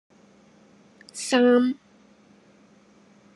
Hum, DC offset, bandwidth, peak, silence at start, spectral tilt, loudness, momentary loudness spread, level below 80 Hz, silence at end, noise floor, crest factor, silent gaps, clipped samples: none; under 0.1%; 11.5 kHz; -8 dBFS; 1.15 s; -3 dB/octave; -21 LUFS; 20 LU; -82 dBFS; 1.65 s; -56 dBFS; 20 dB; none; under 0.1%